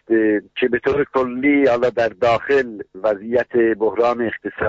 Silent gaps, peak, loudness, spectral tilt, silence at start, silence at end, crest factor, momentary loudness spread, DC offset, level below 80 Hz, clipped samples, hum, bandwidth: none; -6 dBFS; -18 LUFS; -7 dB/octave; 0.1 s; 0 s; 12 dB; 6 LU; under 0.1%; -52 dBFS; under 0.1%; none; 7.8 kHz